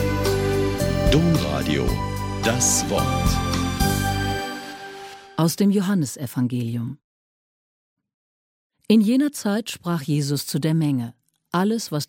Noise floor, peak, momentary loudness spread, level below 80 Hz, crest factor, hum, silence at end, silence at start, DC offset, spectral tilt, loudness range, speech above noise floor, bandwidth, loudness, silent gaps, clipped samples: under -90 dBFS; -6 dBFS; 12 LU; -36 dBFS; 18 dB; none; 0.05 s; 0 s; under 0.1%; -5 dB/octave; 4 LU; over 69 dB; 17 kHz; -22 LUFS; 7.04-7.97 s, 8.14-8.70 s; under 0.1%